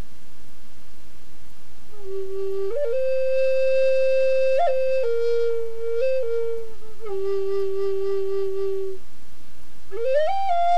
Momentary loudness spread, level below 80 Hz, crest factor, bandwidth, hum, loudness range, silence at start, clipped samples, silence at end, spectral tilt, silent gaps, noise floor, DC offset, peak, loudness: 13 LU; -52 dBFS; 12 dB; 13.5 kHz; none; 6 LU; 0 s; under 0.1%; 0 s; -6 dB/octave; none; -48 dBFS; 10%; -10 dBFS; -24 LUFS